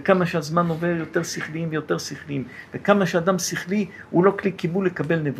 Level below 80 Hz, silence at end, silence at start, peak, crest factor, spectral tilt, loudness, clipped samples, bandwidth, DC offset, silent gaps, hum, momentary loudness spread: -62 dBFS; 0 s; 0 s; -2 dBFS; 20 dB; -5.5 dB/octave; -23 LUFS; under 0.1%; 15.5 kHz; under 0.1%; none; none; 9 LU